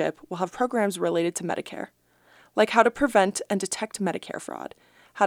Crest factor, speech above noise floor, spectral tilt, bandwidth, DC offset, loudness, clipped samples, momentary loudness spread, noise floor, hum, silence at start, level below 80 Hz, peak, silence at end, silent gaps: 24 dB; 33 dB; -4 dB/octave; 16.5 kHz; under 0.1%; -25 LUFS; under 0.1%; 17 LU; -58 dBFS; none; 0 s; -60 dBFS; -2 dBFS; 0 s; none